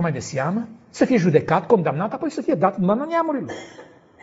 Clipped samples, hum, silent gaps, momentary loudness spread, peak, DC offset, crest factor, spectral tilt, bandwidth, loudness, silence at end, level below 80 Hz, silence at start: under 0.1%; none; none; 13 LU; -4 dBFS; under 0.1%; 18 dB; -7 dB/octave; 8 kHz; -21 LUFS; 0.4 s; -60 dBFS; 0 s